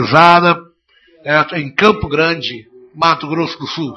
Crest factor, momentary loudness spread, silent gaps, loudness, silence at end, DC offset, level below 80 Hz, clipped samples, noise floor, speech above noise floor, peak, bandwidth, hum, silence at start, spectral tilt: 14 dB; 14 LU; none; -13 LUFS; 0 s; under 0.1%; -46 dBFS; 0.3%; -52 dBFS; 39 dB; 0 dBFS; 12 kHz; none; 0 s; -5.5 dB/octave